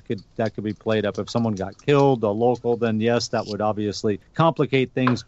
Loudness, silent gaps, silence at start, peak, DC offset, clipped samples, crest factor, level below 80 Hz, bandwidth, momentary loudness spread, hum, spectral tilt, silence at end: -22 LUFS; none; 0.1 s; -6 dBFS; under 0.1%; under 0.1%; 16 dB; -56 dBFS; 8.2 kHz; 8 LU; none; -6.5 dB/octave; 0.05 s